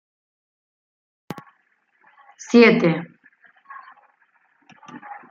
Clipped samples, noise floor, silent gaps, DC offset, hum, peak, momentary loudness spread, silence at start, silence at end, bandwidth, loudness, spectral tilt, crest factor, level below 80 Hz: under 0.1%; -65 dBFS; none; under 0.1%; none; -2 dBFS; 29 LU; 2.5 s; 0.15 s; 7.4 kHz; -16 LUFS; -6 dB/octave; 22 dB; -70 dBFS